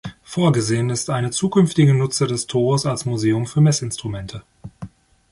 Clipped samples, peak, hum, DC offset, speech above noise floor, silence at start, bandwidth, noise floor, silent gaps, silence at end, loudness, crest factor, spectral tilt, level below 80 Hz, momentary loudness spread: under 0.1%; -4 dBFS; none; under 0.1%; 20 dB; 0.05 s; 11.5 kHz; -39 dBFS; none; 0.45 s; -19 LUFS; 16 dB; -5.5 dB/octave; -50 dBFS; 19 LU